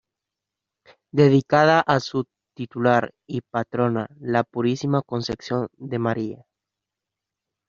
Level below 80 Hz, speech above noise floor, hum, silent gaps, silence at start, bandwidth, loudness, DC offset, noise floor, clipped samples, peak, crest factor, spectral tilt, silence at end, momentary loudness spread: -60 dBFS; 64 dB; none; none; 1.15 s; 7.4 kHz; -22 LUFS; under 0.1%; -86 dBFS; under 0.1%; -2 dBFS; 20 dB; -5.5 dB/octave; 1.35 s; 13 LU